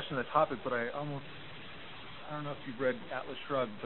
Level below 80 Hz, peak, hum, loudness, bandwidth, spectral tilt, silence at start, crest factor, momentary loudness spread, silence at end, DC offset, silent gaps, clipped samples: -66 dBFS; -14 dBFS; none; -36 LUFS; 4.2 kHz; -3.5 dB/octave; 0 s; 22 dB; 16 LU; 0 s; 0.4%; none; under 0.1%